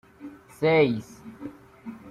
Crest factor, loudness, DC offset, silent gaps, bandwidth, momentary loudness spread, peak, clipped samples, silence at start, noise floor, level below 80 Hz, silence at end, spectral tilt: 18 dB; -23 LUFS; under 0.1%; none; 13 kHz; 24 LU; -10 dBFS; under 0.1%; 0.2 s; -45 dBFS; -62 dBFS; 0 s; -7 dB/octave